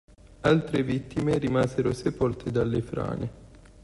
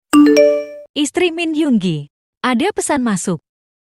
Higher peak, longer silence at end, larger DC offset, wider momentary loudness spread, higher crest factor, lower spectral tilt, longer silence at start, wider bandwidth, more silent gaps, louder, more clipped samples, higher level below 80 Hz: second, -8 dBFS vs 0 dBFS; second, 0.3 s vs 0.5 s; neither; second, 8 LU vs 13 LU; about the same, 18 dB vs 16 dB; first, -7.5 dB/octave vs -4.5 dB/octave; first, 0.4 s vs 0.15 s; second, 11.5 kHz vs 16.5 kHz; second, none vs 0.89-0.94 s, 2.10-2.41 s; second, -27 LUFS vs -16 LUFS; neither; first, -48 dBFS vs -54 dBFS